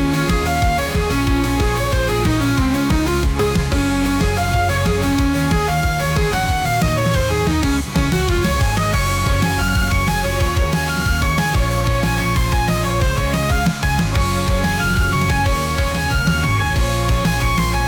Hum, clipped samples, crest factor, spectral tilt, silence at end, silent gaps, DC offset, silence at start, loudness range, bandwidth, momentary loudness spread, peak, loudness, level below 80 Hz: none; under 0.1%; 10 dB; -5 dB/octave; 0 s; none; under 0.1%; 0 s; 0 LU; 19.5 kHz; 1 LU; -6 dBFS; -18 LUFS; -22 dBFS